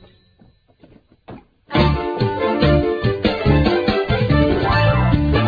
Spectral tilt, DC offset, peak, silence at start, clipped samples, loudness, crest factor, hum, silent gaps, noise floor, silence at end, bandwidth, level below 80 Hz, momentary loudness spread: -9 dB/octave; under 0.1%; -2 dBFS; 1.3 s; under 0.1%; -17 LUFS; 16 dB; none; none; -53 dBFS; 0 s; 5 kHz; -28 dBFS; 4 LU